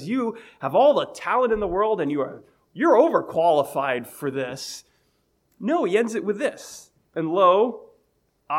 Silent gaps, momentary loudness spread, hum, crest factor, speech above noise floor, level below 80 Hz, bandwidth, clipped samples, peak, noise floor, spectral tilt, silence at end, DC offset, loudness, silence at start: none; 16 LU; none; 18 dB; 46 dB; -56 dBFS; 16 kHz; under 0.1%; -4 dBFS; -68 dBFS; -5 dB/octave; 0 s; under 0.1%; -22 LUFS; 0 s